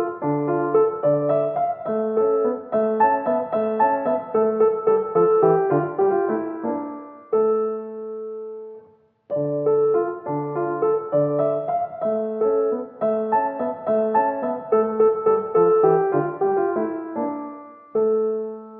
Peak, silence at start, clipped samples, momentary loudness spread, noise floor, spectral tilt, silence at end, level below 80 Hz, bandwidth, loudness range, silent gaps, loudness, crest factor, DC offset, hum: -6 dBFS; 0 s; under 0.1%; 10 LU; -53 dBFS; -8.5 dB/octave; 0 s; -72 dBFS; 3.5 kHz; 5 LU; none; -21 LUFS; 16 dB; under 0.1%; none